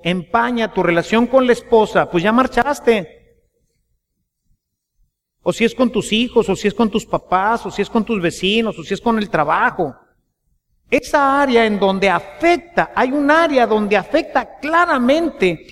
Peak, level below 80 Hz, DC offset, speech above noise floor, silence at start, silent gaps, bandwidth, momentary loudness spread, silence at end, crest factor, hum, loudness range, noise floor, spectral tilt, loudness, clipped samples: 0 dBFS; -44 dBFS; under 0.1%; 57 dB; 0.05 s; none; 14.5 kHz; 6 LU; 0.15 s; 16 dB; none; 6 LU; -73 dBFS; -5 dB/octave; -16 LUFS; under 0.1%